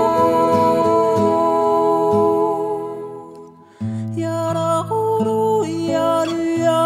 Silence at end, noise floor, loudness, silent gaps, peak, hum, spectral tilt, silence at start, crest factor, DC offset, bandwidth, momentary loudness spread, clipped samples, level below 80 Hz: 0 s; -40 dBFS; -18 LUFS; none; -4 dBFS; none; -6.5 dB/octave; 0 s; 14 dB; under 0.1%; 15 kHz; 11 LU; under 0.1%; -58 dBFS